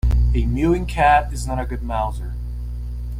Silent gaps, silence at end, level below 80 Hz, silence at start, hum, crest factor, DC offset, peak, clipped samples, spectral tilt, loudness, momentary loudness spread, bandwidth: none; 0 s; -22 dBFS; 0.05 s; 60 Hz at -25 dBFS; 16 dB; under 0.1%; -4 dBFS; under 0.1%; -7 dB/octave; -21 LUFS; 14 LU; 11.5 kHz